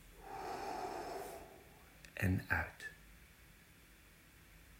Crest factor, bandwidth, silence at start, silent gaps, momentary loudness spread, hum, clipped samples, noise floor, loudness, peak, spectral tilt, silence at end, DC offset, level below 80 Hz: 26 dB; 16 kHz; 0 s; none; 24 LU; none; under 0.1%; -63 dBFS; -42 LUFS; -20 dBFS; -5.5 dB/octave; 0 s; under 0.1%; -60 dBFS